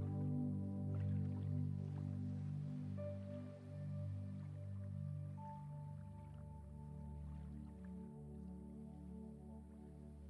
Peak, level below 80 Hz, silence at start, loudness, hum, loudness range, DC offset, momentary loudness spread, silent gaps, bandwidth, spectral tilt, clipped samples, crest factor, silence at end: -32 dBFS; -62 dBFS; 0 s; -48 LUFS; none; 9 LU; under 0.1%; 12 LU; none; 11 kHz; -10.5 dB/octave; under 0.1%; 14 dB; 0 s